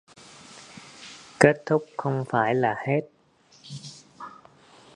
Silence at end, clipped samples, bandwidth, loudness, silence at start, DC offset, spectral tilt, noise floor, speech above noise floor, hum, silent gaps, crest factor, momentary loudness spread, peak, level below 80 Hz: 0.65 s; under 0.1%; 11 kHz; -24 LUFS; 0.5 s; under 0.1%; -6 dB/octave; -59 dBFS; 36 dB; none; none; 26 dB; 24 LU; 0 dBFS; -62 dBFS